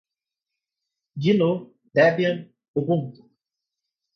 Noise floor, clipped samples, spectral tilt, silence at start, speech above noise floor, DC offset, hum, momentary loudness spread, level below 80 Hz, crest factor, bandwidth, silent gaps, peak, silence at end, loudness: -87 dBFS; under 0.1%; -8 dB/octave; 1.15 s; 66 dB; under 0.1%; none; 14 LU; -68 dBFS; 18 dB; 6.6 kHz; 2.68-2.74 s; -6 dBFS; 1.05 s; -23 LUFS